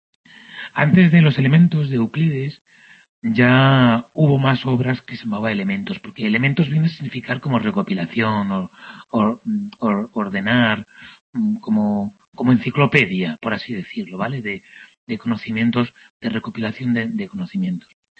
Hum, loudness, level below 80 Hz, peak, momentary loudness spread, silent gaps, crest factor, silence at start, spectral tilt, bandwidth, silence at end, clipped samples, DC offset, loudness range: none; -19 LUFS; -56 dBFS; -2 dBFS; 14 LU; 2.61-2.65 s, 3.09-3.22 s, 11.21-11.33 s, 12.28-12.32 s, 14.97-15.07 s, 16.10-16.20 s; 18 dB; 0.5 s; -8.5 dB/octave; 6.6 kHz; 0.4 s; under 0.1%; under 0.1%; 7 LU